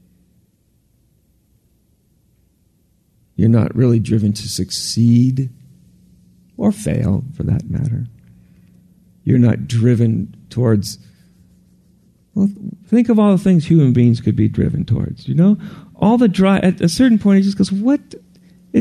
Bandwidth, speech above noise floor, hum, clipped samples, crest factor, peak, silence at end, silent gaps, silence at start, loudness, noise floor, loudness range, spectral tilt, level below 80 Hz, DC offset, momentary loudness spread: 13.5 kHz; 45 dB; none; under 0.1%; 16 dB; -2 dBFS; 0 s; none; 3.4 s; -16 LUFS; -59 dBFS; 6 LU; -7 dB/octave; -44 dBFS; under 0.1%; 10 LU